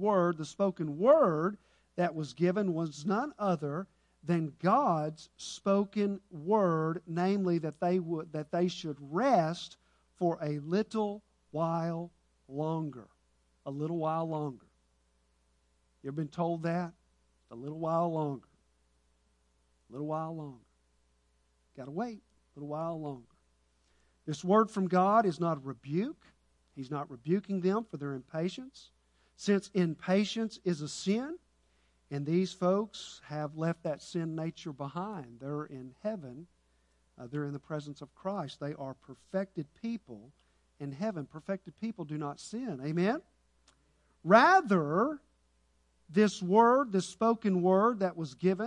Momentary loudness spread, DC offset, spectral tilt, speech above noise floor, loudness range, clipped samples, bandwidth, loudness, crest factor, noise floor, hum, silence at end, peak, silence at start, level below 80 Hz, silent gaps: 17 LU; under 0.1%; -6.5 dB/octave; 40 dB; 12 LU; under 0.1%; 10.5 kHz; -32 LUFS; 24 dB; -72 dBFS; none; 0 s; -8 dBFS; 0 s; -72 dBFS; none